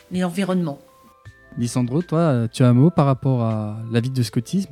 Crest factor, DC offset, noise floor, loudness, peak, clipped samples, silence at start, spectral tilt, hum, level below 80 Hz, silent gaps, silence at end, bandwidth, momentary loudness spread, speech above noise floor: 18 dB; under 0.1%; -47 dBFS; -20 LUFS; -2 dBFS; under 0.1%; 0.1 s; -7.5 dB/octave; none; -56 dBFS; none; 0.05 s; 13.5 kHz; 11 LU; 28 dB